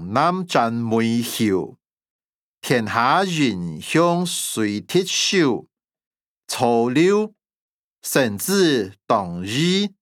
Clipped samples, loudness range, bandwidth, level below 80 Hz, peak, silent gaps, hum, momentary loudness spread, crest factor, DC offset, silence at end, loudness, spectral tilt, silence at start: under 0.1%; 2 LU; 19 kHz; -68 dBFS; -2 dBFS; 1.93-1.97 s, 2.10-2.19 s, 2.25-2.54 s, 6.06-6.11 s, 6.21-6.41 s, 7.56-8.02 s; none; 8 LU; 18 dB; under 0.1%; 0.15 s; -20 LUFS; -4.5 dB/octave; 0 s